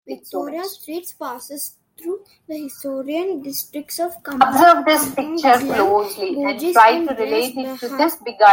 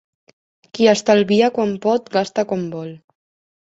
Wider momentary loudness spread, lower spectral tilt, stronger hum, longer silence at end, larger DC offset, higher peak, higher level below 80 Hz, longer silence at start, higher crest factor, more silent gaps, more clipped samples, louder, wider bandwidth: about the same, 18 LU vs 16 LU; second, -2.5 dB/octave vs -5 dB/octave; neither; second, 0 s vs 0.8 s; neither; about the same, -2 dBFS vs -2 dBFS; about the same, -62 dBFS vs -62 dBFS; second, 0.1 s vs 0.75 s; about the same, 16 dB vs 18 dB; neither; neither; about the same, -18 LUFS vs -17 LUFS; first, 17 kHz vs 8 kHz